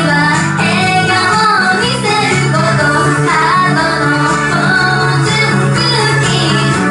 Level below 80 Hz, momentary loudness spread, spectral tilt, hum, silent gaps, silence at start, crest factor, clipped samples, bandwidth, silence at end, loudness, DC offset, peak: -40 dBFS; 2 LU; -4.5 dB/octave; none; none; 0 s; 10 dB; under 0.1%; 11.5 kHz; 0 s; -10 LUFS; under 0.1%; 0 dBFS